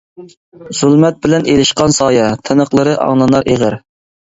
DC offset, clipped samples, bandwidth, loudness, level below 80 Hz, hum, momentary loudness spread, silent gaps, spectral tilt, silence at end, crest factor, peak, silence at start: under 0.1%; under 0.1%; 8 kHz; -11 LUFS; -42 dBFS; none; 5 LU; 0.37-0.52 s; -5 dB/octave; 0.55 s; 12 dB; 0 dBFS; 0.2 s